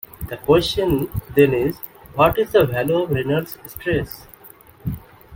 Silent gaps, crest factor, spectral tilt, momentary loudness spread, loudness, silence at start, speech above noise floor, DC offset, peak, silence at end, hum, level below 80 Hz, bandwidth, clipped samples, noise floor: none; 20 dB; -6.5 dB/octave; 16 LU; -19 LUFS; 0.2 s; 27 dB; under 0.1%; 0 dBFS; 0 s; none; -40 dBFS; 17 kHz; under 0.1%; -46 dBFS